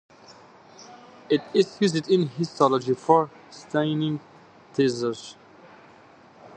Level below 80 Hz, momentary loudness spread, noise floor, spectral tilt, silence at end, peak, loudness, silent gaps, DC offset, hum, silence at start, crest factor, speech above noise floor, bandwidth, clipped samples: -72 dBFS; 20 LU; -51 dBFS; -6 dB/octave; 0.1 s; -4 dBFS; -24 LUFS; none; under 0.1%; none; 0.8 s; 22 dB; 28 dB; 9.2 kHz; under 0.1%